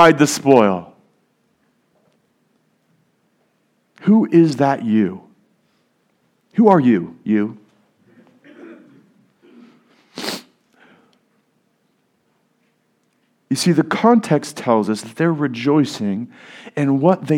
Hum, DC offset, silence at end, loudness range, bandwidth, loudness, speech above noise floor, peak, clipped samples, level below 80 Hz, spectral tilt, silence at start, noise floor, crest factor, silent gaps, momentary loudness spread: none; under 0.1%; 0 s; 18 LU; 16 kHz; -17 LUFS; 49 dB; 0 dBFS; under 0.1%; -66 dBFS; -6 dB/octave; 0 s; -64 dBFS; 20 dB; none; 14 LU